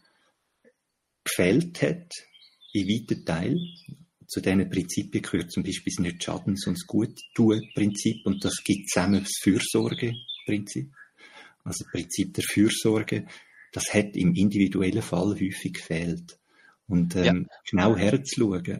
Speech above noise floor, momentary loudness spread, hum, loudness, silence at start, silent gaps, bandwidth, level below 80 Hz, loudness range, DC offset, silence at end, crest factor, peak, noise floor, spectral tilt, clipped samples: 53 dB; 11 LU; none; -26 LUFS; 1.25 s; none; 15.5 kHz; -56 dBFS; 4 LU; under 0.1%; 0 s; 20 dB; -6 dBFS; -79 dBFS; -5 dB/octave; under 0.1%